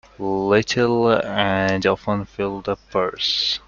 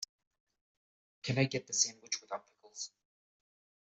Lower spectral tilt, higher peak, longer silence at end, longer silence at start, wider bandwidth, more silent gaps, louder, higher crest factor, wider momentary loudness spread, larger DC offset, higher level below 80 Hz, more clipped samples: first, -5 dB/octave vs -3 dB/octave; first, -2 dBFS vs -14 dBFS; second, 0.1 s vs 0.95 s; second, 0.2 s vs 1.25 s; second, 7.4 kHz vs 8.2 kHz; neither; first, -20 LUFS vs -35 LUFS; second, 18 dB vs 26 dB; second, 8 LU vs 14 LU; neither; first, -50 dBFS vs -76 dBFS; neither